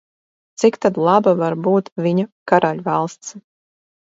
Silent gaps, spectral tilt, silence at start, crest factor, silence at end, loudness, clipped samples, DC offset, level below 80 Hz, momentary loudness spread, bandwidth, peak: 1.92-1.96 s, 2.32-2.46 s; -6.5 dB/octave; 0.6 s; 18 dB; 0.75 s; -18 LUFS; under 0.1%; under 0.1%; -66 dBFS; 7 LU; 8 kHz; 0 dBFS